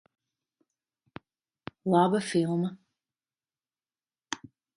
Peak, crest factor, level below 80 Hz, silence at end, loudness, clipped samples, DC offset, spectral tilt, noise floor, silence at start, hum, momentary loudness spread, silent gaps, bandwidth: -10 dBFS; 22 dB; -74 dBFS; 0.4 s; -28 LUFS; under 0.1%; under 0.1%; -6 dB/octave; under -90 dBFS; 1.85 s; none; 18 LU; none; 11.5 kHz